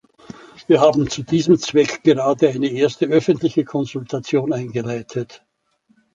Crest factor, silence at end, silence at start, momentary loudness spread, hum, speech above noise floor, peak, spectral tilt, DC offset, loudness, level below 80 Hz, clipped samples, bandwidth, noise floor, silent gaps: 16 dB; 0.8 s; 0.6 s; 11 LU; none; 44 dB; -2 dBFS; -6 dB/octave; under 0.1%; -18 LUFS; -56 dBFS; under 0.1%; 7.8 kHz; -62 dBFS; none